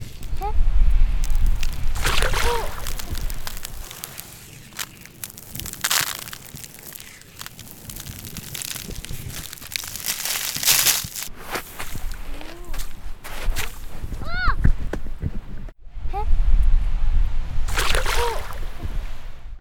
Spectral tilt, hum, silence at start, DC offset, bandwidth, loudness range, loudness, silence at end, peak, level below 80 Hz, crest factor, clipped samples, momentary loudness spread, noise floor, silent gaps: -2.5 dB/octave; none; 0 s; under 0.1%; 19 kHz; 10 LU; -25 LUFS; 0 s; 0 dBFS; -24 dBFS; 20 dB; under 0.1%; 16 LU; -41 dBFS; none